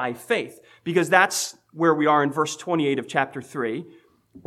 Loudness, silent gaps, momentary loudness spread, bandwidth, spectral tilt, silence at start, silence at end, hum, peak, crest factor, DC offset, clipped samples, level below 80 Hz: -23 LUFS; none; 12 LU; 15.5 kHz; -4 dB/octave; 0 s; 0.1 s; none; 0 dBFS; 22 dB; under 0.1%; under 0.1%; -74 dBFS